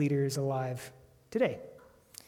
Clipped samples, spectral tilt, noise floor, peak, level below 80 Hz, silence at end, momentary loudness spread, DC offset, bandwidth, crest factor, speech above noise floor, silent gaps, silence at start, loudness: under 0.1%; -6.5 dB/octave; -55 dBFS; -16 dBFS; -70 dBFS; 0.5 s; 20 LU; under 0.1%; 16.5 kHz; 16 dB; 23 dB; none; 0 s; -33 LUFS